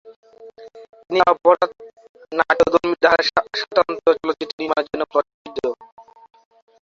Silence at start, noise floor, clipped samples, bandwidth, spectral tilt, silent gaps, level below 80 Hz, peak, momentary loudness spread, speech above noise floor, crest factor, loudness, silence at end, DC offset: 0.05 s; -42 dBFS; under 0.1%; 7.4 kHz; -4 dB/octave; 0.16-0.23 s, 0.89-0.93 s, 2.09-2.14 s, 4.53-4.58 s, 5.34-5.45 s, 5.92-5.97 s; -56 dBFS; -2 dBFS; 11 LU; 25 dB; 20 dB; -19 LUFS; 0.8 s; under 0.1%